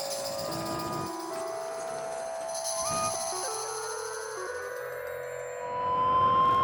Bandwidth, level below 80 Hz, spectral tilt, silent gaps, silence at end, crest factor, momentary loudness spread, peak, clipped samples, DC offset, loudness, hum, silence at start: 19 kHz; -62 dBFS; -2.5 dB/octave; none; 0 s; 16 dB; 12 LU; -16 dBFS; under 0.1%; under 0.1%; -31 LUFS; none; 0 s